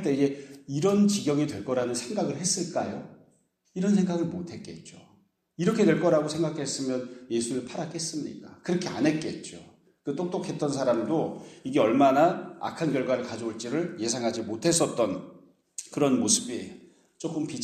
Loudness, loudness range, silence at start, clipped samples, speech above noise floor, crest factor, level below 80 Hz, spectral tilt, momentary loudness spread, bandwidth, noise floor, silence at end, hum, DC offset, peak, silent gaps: -27 LUFS; 5 LU; 0 s; under 0.1%; 39 dB; 20 dB; -68 dBFS; -4.5 dB/octave; 15 LU; 14.5 kHz; -66 dBFS; 0 s; none; under 0.1%; -8 dBFS; none